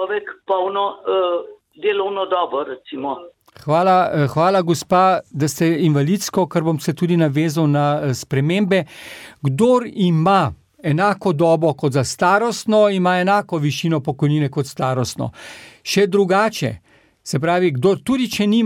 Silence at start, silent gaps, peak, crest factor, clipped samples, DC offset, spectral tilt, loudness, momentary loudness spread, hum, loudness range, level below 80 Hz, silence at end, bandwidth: 0 s; none; -2 dBFS; 16 dB; under 0.1%; under 0.1%; -6 dB/octave; -18 LUFS; 11 LU; none; 3 LU; -56 dBFS; 0 s; 17 kHz